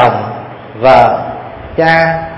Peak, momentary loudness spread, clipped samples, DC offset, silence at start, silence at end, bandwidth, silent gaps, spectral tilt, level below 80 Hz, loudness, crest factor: 0 dBFS; 19 LU; 0.9%; under 0.1%; 0 s; 0 s; 8.4 kHz; none; -7 dB/octave; -38 dBFS; -10 LUFS; 12 dB